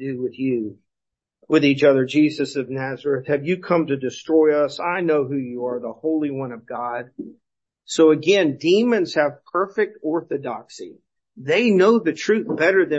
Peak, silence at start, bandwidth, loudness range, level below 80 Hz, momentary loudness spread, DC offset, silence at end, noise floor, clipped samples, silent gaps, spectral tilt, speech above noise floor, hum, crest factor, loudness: -4 dBFS; 0 s; 8.2 kHz; 3 LU; -70 dBFS; 14 LU; under 0.1%; 0 s; -85 dBFS; under 0.1%; none; -5.5 dB/octave; 65 dB; none; 16 dB; -20 LUFS